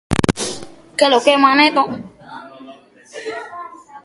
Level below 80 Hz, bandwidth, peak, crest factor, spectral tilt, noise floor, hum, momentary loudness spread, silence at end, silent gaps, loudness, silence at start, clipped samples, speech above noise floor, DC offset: -42 dBFS; 11.5 kHz; 0 dBFS; 18 dB; -4 dB/octave; -42 dBFS; none; 24 LU; 0.05 s; none; -15 LUFS; 0.1 s; under 0.1%; 28 dB; under 0.1%